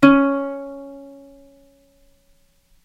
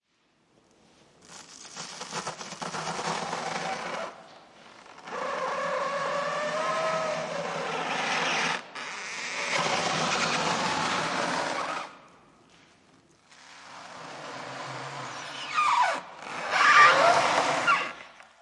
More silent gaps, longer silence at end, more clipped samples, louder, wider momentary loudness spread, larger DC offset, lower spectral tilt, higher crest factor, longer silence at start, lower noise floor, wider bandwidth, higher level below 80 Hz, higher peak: neither; first, 1.85 s vs 0.2 s; neither; first, -20 LUFS vs -27 LUFS; first, 26 LU vs 17 LU; neither; first, -7 dB/octave vs -2 dB/octave; about the same, 22 dB vs 24 dB; second, 0 s vs 1.3 s; second, -58 dBFS vs -69 dBFS; second, 8 kHz vs 11.5 kHz; first, -52 dBFS vs -72 dBFS; first, 0 dBFS vs -4 dBFS